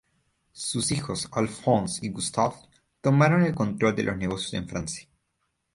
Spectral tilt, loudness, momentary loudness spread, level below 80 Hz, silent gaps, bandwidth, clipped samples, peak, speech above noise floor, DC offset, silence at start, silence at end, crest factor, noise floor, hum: -5 dB/octave; -26 LUFS; 11 LU; -54 dBFS; none; 11.5 kHz; under 0.1%; -8 dBFS; 51 dB; under 0.1%; 0.55 s; 0.7 s; 20 dB; -76 dBFS; none